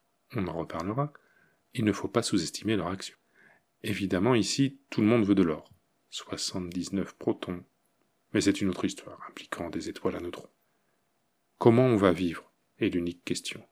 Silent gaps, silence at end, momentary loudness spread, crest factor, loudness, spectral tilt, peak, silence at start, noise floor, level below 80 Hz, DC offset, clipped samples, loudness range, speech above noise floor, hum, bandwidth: none; 0.1 s; 16 LU; 24 dB; -29 LUFS; -5.5 dB/octave; -6 dBFS; 0.3 s; -75 dBFS; -62 dBFS; under 0.1%; under 0.1%; 5 LU; 47 dB; none; 16 kHz